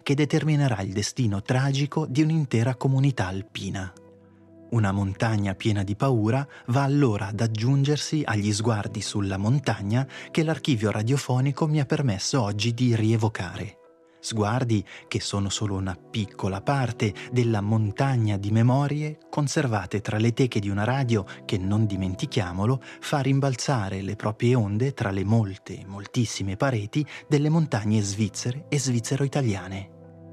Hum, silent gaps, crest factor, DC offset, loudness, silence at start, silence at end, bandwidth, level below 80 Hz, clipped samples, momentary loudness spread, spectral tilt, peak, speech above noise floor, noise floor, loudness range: none; none; 16 dB; under 0.1%; -25 LUFS; 0.05 s; 0 s; 12.5 kHz; -64 dBFS; under 0.1%; 8 LU; -6 dB/octave; -10 dBFS; 27 dB; -52 dBFS; 3 LU